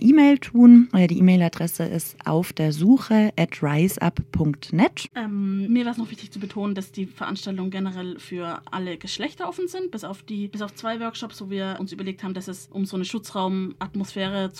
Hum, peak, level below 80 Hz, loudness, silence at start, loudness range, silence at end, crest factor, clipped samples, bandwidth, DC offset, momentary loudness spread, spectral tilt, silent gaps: none; -4 dBFS; -52 dBFS; -22 LUFS; 0 s; 13 LU; 0 s; 18 dB; under 0.1%; 16 kHz; under 0.1%; 15 LU; -6.5 dB/octave; none